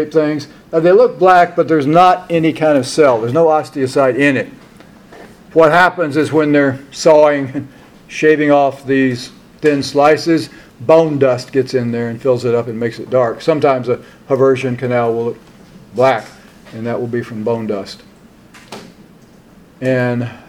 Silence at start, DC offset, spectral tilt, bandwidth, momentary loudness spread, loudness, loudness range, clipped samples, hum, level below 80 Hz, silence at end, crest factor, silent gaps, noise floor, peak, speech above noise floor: 0 s; under 0.1%; -6 dB/octave; 14 kHz; 14 LU; -14 LUFS; 8 LU; under 0.1%; none; -54 dBFS; 0.1 s; 14 dB; none; -43 dBFS; 0 dBFS; 30 dB